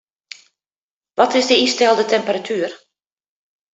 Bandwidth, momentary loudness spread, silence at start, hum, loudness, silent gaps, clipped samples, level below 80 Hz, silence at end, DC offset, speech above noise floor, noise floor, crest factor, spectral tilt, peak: 8.4 kHz; 11 LU; 1.2 s; none; -16 LUFS; none; under 0.1%; -66 dBFS; 0.95 s; under 0.1%; over 74 dB; under -90 dBFS; 20 dB; -2.5 dB/octave; 0 dBFS